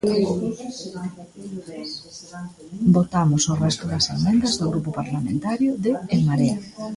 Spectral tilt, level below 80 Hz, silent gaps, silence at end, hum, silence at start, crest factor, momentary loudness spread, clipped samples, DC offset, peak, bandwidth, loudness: -5.5 dB/octave; -50 dBFS; none; 0 s; none; 0.05 s; 16 dB; 17 LU; under 0.1%; under 0.1%; -6 dBFS; 11.5 kHz; -22 LUFS